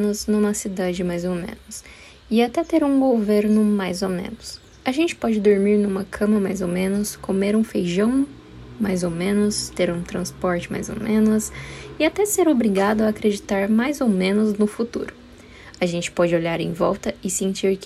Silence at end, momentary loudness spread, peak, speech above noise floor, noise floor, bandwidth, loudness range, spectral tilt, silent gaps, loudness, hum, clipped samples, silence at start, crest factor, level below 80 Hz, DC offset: 0 s; 11 LU; -6 dBFS; 23 dB; -43 dBFS; 14.5 kHz; 3 LU; -5.5 dB/octave; none; -21 LUFS; none; under 0.1%; 0 s; 16 dB; -48 dBFS; under 0.1%